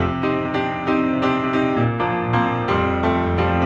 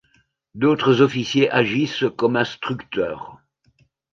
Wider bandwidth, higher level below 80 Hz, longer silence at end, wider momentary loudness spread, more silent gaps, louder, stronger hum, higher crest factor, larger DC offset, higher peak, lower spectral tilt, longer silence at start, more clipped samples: about the same, 7.6 kHz vs 7.4 kHz; first, -40 dBFS vs -60 dBFS; second, 0 s vs 0.8 s; second, 3 LU vs 11 LU; neither; about the same, -20 LUFS vs -20 LUFS; neither; second, 14 dB vs 20 dB; neither; second, -6 dBFS vs -2 dBFS; first, -8 dB/octave vs -6 dB/octave; second, 0 s vs 0.55 s; neither